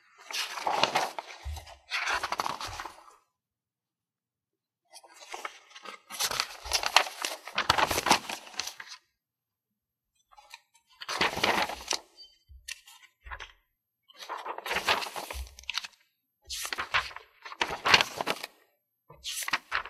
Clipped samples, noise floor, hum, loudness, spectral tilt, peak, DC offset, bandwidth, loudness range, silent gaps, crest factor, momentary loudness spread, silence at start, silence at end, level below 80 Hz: under 0.1%; under -90 dBFS; none; -30 LUFS; -1 dB/octave; -2 dBFS; under 0.1%; 16 kHz; 10 LU; none; 32 dB; 20 LU; 0.2 s; 0 s; -54 dBFS